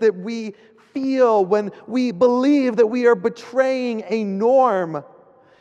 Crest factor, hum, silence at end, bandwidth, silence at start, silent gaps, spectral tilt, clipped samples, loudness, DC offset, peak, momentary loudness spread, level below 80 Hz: 14 dB; none; 0.55 s; 8.4 kHz; 0 s; none; -6.5 dB/octave; under 0.1%; -19 LUFS; under 0.1%; -4 dBFS; 12 LU; -74 dBFS